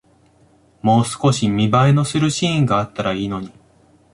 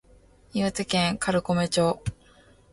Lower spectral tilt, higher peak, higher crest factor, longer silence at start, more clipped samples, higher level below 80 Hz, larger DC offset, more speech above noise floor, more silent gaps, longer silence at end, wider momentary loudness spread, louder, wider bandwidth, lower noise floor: first, -6 dB/octave vs -4.5 dB/octave; first, -2 dBFS vs -10 dBFS; about the same, 16 dB vs 18 dB; first, 0.85 s vs 0.55 s; neither; about the same, -48 dBFS vs -50 dBFS; neither; first, 37 dB vs 31 dB; neither; about the same, 0.65 s vs 0.6 s; about the same, 9 LU vs 10 LU; first, -18 LUFS vs -26 LUFS; about the same, 11.5 kHz vs 11.5 kHz; about the same, -54 dBFS vs -56 dBFS